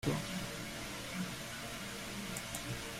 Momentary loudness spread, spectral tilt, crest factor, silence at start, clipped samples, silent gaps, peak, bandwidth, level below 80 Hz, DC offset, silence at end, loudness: 3 LU; -3.5 dB/octave; 20 dB; 0 s; under 0.1%; none; -20 dBFS; 16 kHz; -58 dBFS; under 0.1%; 0 s; -41 LUFS